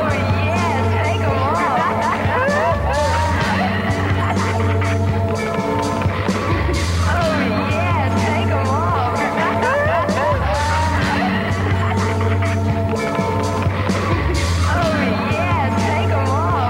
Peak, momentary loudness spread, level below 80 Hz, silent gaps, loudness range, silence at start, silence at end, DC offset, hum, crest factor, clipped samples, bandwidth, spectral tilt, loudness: -8 dBFS; 2 LU; -32 dBFS; none; 1 LU; 0 s; 0 s; under 0.1%; none; 10 dB; under 0.1%; 13 kHz; -6 dB/octave; -18 LUFS